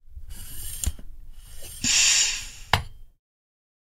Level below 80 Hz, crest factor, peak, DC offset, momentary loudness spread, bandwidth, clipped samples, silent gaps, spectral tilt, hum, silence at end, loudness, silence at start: -40 dBFS; 28 dB; 0 dBFS; under 0.1%; 24 LU; 16 kHz; under 0.1%; none; 0 dB/octave; none; 0.95 s; -22 LUFS; 0.05 s